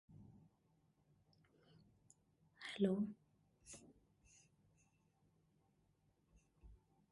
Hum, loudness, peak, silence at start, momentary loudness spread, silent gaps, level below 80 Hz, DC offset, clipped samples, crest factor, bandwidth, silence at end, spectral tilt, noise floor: none; -43 LUFS; -24 dBFS; 0.1 s; 25 LU; none; -76 dBFS; under 0.1%; under 0.1%; 28 dB; 11.5 kHz; 0.35 s; -6 dB/octave; -79 dBFS